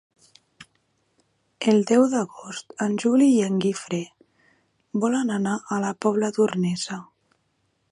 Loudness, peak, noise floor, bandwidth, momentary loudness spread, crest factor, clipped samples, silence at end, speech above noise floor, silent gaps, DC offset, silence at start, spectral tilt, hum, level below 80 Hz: -23 LUFS; -6 dBFS; -71 dBFS; 11.5 kHz; 13 LU; 18 dB; under 0.1%; 0.9 s; 49 dB; none; under 0.1%; 0.6 s; -5.5 dB/octave; none; -72 dBFS